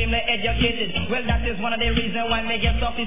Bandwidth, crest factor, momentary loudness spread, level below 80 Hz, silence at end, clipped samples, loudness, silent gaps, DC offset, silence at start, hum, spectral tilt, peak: 3.8 kHz; 16 dB; 3 LU; -28 dBFS; 0 s; under 0.1%; -22 LUFS; none; 3%; 0 s; none; -9 dB/octave; -6 dBFS